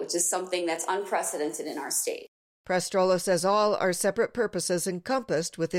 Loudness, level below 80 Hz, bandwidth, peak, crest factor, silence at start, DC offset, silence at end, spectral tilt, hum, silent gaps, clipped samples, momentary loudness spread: -27 LUFS; -68 dBFS; 16.5 kHz; -14 dBFS; 14 dB; 0 s; under 0.1%; 0 s; -3 dB/octave; none; 2.28-2.64 s; under 0.1%; 6 LU